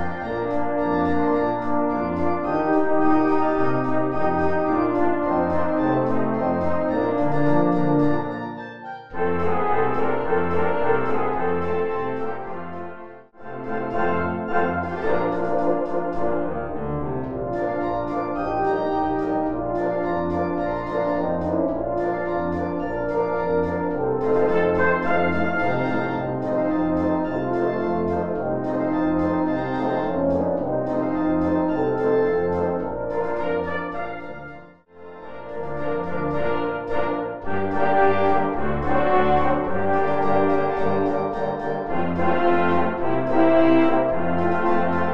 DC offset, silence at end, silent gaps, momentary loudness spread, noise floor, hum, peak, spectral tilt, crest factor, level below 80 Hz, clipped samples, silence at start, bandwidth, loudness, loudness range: under 0.1%; 0 s; none; 8 LU; -44 dBFS; none; -6 dBFS; -9 dB/octave; 16 dB; -46 dBFS; under 0.1%; 0 s; 6.6 kHz; -23 LUFS; 5 LU